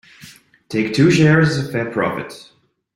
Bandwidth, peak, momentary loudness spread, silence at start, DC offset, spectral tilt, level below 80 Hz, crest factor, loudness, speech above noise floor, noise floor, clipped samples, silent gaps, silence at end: 12 kHz; -2 dBFS; 13 LU; 0.25 s; under 0.1%; -6.5 dB/octave; -50 dBFS; 16 dB; -16 LUFS; 29 dB; -44 dBFS; under 0.1%; none; 0.5 s